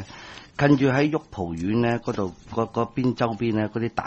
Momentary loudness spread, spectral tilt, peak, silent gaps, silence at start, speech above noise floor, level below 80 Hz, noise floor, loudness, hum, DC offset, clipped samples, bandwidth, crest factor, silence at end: 11 LU; -7.5 dB/octave; -6 dBFS; none; 0 s; 19 dB; -50 dBFS; -43 dBFS; -24 LUFS; none; under 0.1%; under 0.1%; 8.2 kHz; 18 dB; 0 s